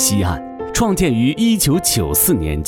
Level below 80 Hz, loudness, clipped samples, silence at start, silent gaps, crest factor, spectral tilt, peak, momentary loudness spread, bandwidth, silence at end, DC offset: -30 dBFS; -16 LUFS; under 0.1%; 0 s; none; 12 dB; -4 dB/octave; -4 dBFS; 7 LU; 18 kHz; 0 s; under 0.1%